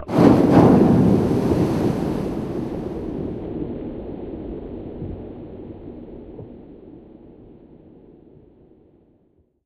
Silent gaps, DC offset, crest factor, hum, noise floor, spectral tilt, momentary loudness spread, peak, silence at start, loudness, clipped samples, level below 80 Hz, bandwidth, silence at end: none; under 0.1%; 20 dB; none; -61 dBFS; -9 dB/octave; 25 LU; -2 dBFS; 0 s; -19 LUFS; under 0.1%; -40 dBFS; 13.5 kHz; 2.35 s